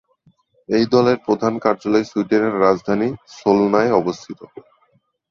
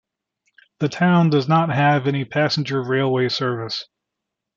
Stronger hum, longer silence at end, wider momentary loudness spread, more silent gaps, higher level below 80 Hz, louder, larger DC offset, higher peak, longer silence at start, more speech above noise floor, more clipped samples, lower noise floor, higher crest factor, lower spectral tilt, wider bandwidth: neither; about the same, 0.85 s vs 0.75 s; about the same, 9 LU vs 10 LU; neither; first, -56 dBFS vs -64 dBFS; about the same, -18 LUFS vs -19 LUFS; neither; about the same, -2 dBFS vs -4 dBFS; about the same, 0.7 s vs 0.8 s; second, 45 dB vs 63 dB; neither; second, -62 dBFS vs -82 dBFS; about the same, 18 dB vs 16 dB; about the same, -6.5 dB/octave vs -6.5 dB/octave; about the same, 7.4 kHz vs 7.4 kHz